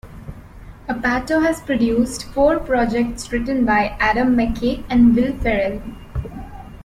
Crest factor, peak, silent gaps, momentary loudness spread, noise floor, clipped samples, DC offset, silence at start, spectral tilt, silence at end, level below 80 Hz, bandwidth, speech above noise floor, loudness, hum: 14 dB; -4 dBFS; none; 18 LU; -38 dBFS; under 0.1%; under 0.1%; 0.05 s; -6 dB/octave; 0 s; -34 dBFS; 13.5 kHz; 21 dB; -18 LUFS; none